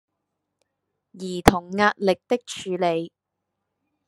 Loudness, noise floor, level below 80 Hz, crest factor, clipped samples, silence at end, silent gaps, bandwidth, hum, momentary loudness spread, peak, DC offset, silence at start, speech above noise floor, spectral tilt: -23 LUFS; -81 dBFS; -44 dBFS; 26 dB; under 0.1%; 1 s; none; 13 kHz; none; 13 LU; 0 dBFS; under 0.1%; 1.15 s; 59 dB; -5 dB/octave